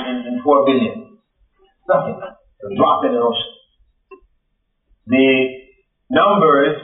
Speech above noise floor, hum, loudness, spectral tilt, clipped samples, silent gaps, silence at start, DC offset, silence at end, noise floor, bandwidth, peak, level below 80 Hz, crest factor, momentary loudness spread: 54 dB; none; -16 LUFS; -3.5 dB/octave; under 0.1%; none; 0 s; under 0.1%; 0 s; -69 dBFS; 4.1 kHz; -2 dBFS; -58 dBFS; 16 dB; 19 LU